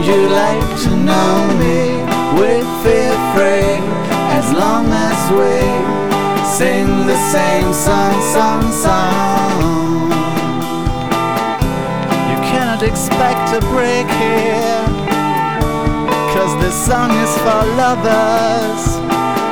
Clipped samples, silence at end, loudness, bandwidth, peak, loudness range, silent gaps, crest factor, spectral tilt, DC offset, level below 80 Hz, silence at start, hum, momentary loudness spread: under 0.1%; 0 s; -14 LUFS; over 20 kHz; -4 dBFS; 2 LU; none; 10 dB; -5 dB/octave; 4%; -28 dBFS; 0 s; none; 4 LU